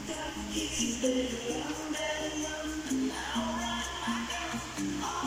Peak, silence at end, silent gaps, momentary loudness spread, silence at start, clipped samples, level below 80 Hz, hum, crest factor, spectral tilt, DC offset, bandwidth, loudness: -16 dBFS; 0 s; none; 5 LU; 0 s; under 0.1%; -50 dBFS; none; 18 dB; -3 dB/octave; under 0.1%; 16 kHz; -33 LUFS